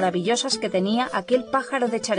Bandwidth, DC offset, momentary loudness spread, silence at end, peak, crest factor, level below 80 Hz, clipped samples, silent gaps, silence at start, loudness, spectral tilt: 10 kHz; under 0.1%; 2 LU; 0 s; -8 dBFS; 16 dB; -64 dBFS; under 0.1%; none; 0 s; -23 LUFS; -4 dB/octave